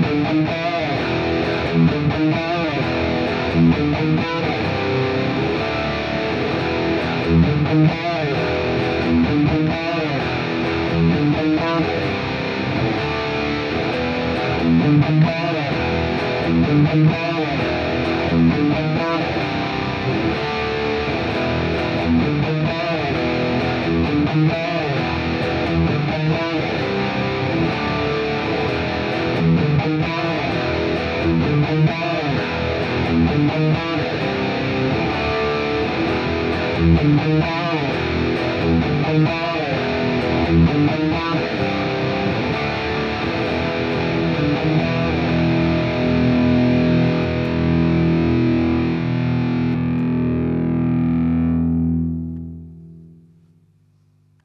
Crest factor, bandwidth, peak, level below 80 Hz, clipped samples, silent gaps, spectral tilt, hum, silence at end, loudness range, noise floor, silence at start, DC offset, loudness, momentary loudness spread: 14 dB; 7 kHz; -4 dBFS; -36 dBFS; under 0.1%; none; -8 dB/octave; none; 1.35 s; 3 LU; -57 dBFS; 0 s; under 0.1%; -19 LUFS; 5 LU